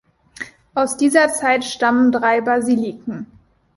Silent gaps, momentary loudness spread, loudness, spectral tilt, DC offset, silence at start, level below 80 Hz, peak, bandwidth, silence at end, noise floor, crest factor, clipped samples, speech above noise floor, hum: none; 19 LU; -17 LUFS; -3.5 dB/octave; under 0.1%; 0.4 s; -58 dBFS; -2 dBFS; 11.5 kHz; 0.5 s; -36 dBFS; 16 dB; under 0.1%; 20 dB; none